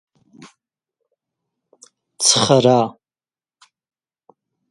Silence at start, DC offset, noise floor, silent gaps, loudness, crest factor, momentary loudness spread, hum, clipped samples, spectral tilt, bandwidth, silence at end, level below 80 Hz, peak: 2.2 s; under 0.1%; under -90 dBFS; none; -15 LUFS; 22 dB; 6 LU; none; under 0.1%; -3.5 dB/octave; 11.5 kHz; 1.8 s; -62 dBFS; 0 dBFS